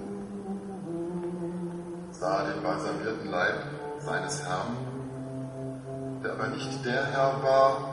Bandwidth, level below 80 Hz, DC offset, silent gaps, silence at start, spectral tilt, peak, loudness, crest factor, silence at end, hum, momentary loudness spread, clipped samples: 11.5 kHz; -62 dBFS; under 0.1%; none; 0 s; -5.5 dB/octave; -10 dBFS; -31 LUFS; 20 dB; 0 s; none; 12 LU; under 0.1%